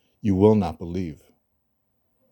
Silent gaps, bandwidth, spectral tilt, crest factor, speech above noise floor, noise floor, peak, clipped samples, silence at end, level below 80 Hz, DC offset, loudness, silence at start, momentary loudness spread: none; 18 kHz; -9.5 dB/octave; 20 dB; 51 dB; -72 dBFS; -4 dBFS; under 0.1%; 1.15 s; -52 dBFS; under 0.1%; -22 LUFS; 0.25 s; 13 LU